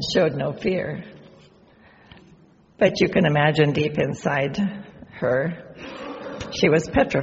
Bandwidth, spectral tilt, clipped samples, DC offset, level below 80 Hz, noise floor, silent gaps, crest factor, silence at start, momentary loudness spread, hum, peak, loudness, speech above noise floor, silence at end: 8 kHz; -5 dB/octave; under 0.1%; under 0.1%; -48 dBFS; -53 dBFS; none; 20 dB; 0 s; 17 LU; none; -2 dBFS; -22 LUFS; 32 dB; 0 s